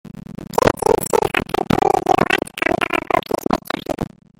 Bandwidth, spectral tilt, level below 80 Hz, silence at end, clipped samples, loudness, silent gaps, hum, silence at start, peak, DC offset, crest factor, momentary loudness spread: 17 kHz; -4.5 dB/octave; -42 dBFS; 0.35 s; under 0.1%; -19 LUFS; none; none; 0.05 s; 0 dBFS; under 0.1%; 18 dB; 9 LU